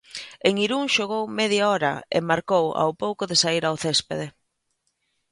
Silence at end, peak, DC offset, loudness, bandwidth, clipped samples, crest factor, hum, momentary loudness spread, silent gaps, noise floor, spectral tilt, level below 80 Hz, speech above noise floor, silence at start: 1 s; -6 dBFS; under 0.1%; -23 LUFS; 11.5 kHz; under 0.1%; 20 dB; none; 7 LU; none; -74 dBFS; -3.5 dB/octave; -64 dBFS; 51 dB; 0.15 s